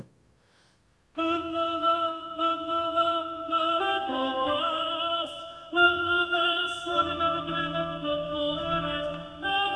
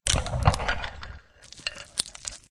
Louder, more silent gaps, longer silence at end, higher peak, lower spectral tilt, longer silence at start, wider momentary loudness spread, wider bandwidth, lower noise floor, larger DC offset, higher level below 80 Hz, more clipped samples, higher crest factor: about the same, -27 LUFS vs -29 LUFS; neither; second, 0 s vs 0.15 s; second, -8 dBFS vs 0 dBFS; first, -4.5 dB/octave vs -3 dB/octave; about the same, 0 s vs 0.05 s; second, 7 LU vs 19 LU; second, 11 kHz vs 13.5 kHz; first, -65 dBFS vs -49 dBFS; neither; second, -58 dBFS vs -36 dBFS; neither; second, 20 dB vs 28 dB